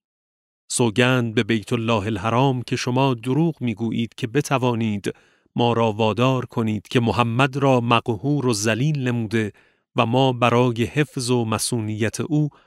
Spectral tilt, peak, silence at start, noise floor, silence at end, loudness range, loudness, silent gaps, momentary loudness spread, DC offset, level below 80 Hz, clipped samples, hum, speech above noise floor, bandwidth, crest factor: -5.5 dB/octave; -2 dBFS; 0.7 s; under -90 dBFS; 0.15 s; 2 LU; -21 LUFS; none; 7 LU; under 0.1%; -58 dBFS; under 0.1%; none; over 69 dB; 14.5 kHz; 20 dB